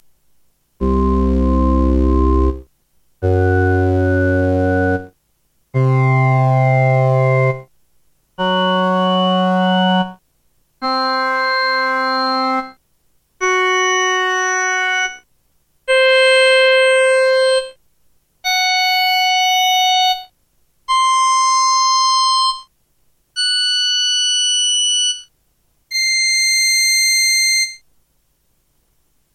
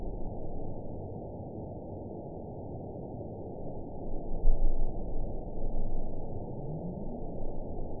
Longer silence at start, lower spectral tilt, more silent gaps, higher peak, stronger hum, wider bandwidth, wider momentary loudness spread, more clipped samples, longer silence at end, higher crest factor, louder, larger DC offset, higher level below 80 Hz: first, 0.8 s vs 0 s; second, -3.5 dB/octave vs -15.5 dB/octave; neither; first, -2 dBFS vs -10 dBFS; neither; first, 13.5 kHz vs 1 kHz; first, 9 LU vs 6 LU; neither; first, 1.6 s vs 0 s; second, 14 dB vs 20 dB; first, -14 LUFS vs -40 LUFS; second, under 0.1% vs 0.3%; about the same, -28 dBFS vs -32 dBFS